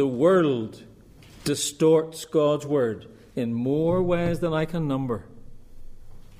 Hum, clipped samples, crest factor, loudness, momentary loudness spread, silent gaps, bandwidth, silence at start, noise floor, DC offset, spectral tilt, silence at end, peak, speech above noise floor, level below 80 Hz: none; under 0.1%; 16 dB; -24 LUFS; 12 LU; none; 15.5 kHz; 0 s; -49 dBFS; under 0.1%; -6 dB/octave; 0.05 s; -8 dBFS; 26 dB; -46 dBFS